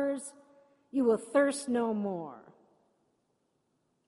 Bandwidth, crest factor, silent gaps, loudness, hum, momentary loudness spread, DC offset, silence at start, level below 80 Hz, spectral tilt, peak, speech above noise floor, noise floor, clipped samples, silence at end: 11.5 kHz; 18 dB; none; -31 LUFS; none; 14 LU; under 0.1%; 0 s; -78 dBFS; -5 dB/octave; -16 dBFS; 47 dB; -77 dBFS; under 0.1%; 1.65 s